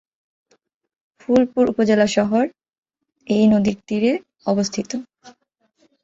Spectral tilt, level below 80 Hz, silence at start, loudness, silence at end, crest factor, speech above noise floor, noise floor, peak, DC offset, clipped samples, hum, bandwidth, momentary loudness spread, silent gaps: -6 dB/octave; -56 dBFS; 1.3 s; -19 LUFS; 0.75 s; 16 dB; 47 dB; -65 dBFS; -4 dBFS; under 0.1%; under 0.1%; none; 7.8 kHz; 10 LU; 2.78-2.83 s